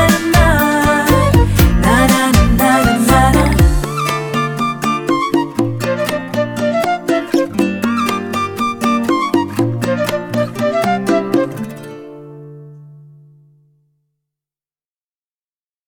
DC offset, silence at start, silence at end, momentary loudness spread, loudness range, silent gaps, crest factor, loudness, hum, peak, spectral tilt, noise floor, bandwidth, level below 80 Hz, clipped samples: under 0.1%; 0 s; 2.9 s; 8 LU; 9 LU; none; 14 dB; -14 LUFS; none; 0 dBFS; -5.5 dB/octave; under -90 dBFS; over 20 kHz; -24 dBFS; under 0.1%